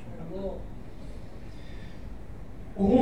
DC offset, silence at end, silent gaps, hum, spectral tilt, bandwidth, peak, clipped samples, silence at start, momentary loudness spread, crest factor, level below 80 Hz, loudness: 0.9%; 0 s; none; none; -9 dB/octave; 10 kHz; -10 dBFS; under 0.1%; 0 s; 14 LU; 22 dB; -44 dBFS; -36 LUFS